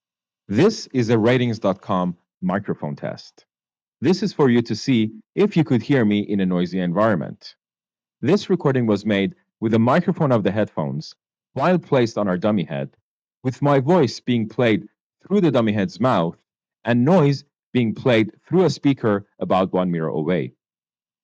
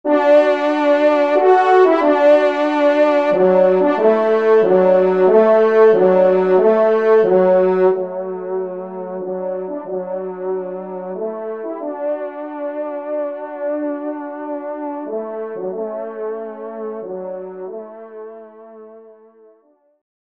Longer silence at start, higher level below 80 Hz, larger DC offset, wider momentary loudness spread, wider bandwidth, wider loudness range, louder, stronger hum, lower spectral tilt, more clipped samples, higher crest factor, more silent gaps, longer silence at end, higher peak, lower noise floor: first, 0.5 s vs 0.05 s; first, -62 dBFS vs -70 dBFS; second, under 0.1% vs 0.1%; second, 11 LU vs 16 LU; about the same, 7.8 kHz vs 7.2 kHz; second, 3 LU vs 15 LU; second, -20 LUFS vs -16 LUFS; neither; about the same, -7.5 dB/octave vs -7.5 dB/octave; neither; about the same, 12 dB vs 16 dB; first, 2.37-2.41 s, 3.82-3.92 s, 13.02-13.22 s, 15.01-15.10 s, 17.66-17.73 s vs none; second, 0.75 s vs 1.25 s; second, -8 dBFS vs -2 dBFS; first, under -90 dBFS vs -56 dBFS